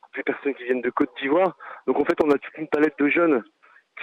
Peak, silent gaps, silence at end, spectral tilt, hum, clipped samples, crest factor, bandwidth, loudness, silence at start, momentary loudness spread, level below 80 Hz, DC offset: -10 dBFS; none; 0 s; -7 dB/octave; none; under 0.1%; 14 dB; 7.8 kHz; -23 LUFS; 0.15 s; 7 LU; -66 dBFS; under 0.1%